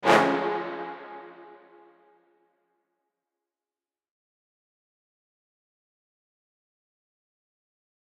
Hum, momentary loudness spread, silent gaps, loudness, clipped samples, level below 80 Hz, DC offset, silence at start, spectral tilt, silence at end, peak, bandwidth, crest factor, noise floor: none; 26 LU; none; -26 LUFS; under 0.1%; -86 dBFS; under 0.1%; 0 s; -4.5 dB/octave; 6.5 s; -6 dBFS; 11.5 kHz; 28 dB; under -90 dBFS